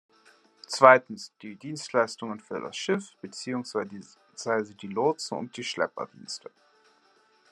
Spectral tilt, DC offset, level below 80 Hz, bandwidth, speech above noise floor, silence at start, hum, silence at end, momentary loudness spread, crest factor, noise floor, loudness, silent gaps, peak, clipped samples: -4 dB/octave; under 0.1%; -82 dBFS; 12 kHz; 36 dB; 0.7 s; none; 1.15 s; 21 LU; 28 dB; -64 dBFS; -27 LUFS; none; -2 dBFS; under 0.1%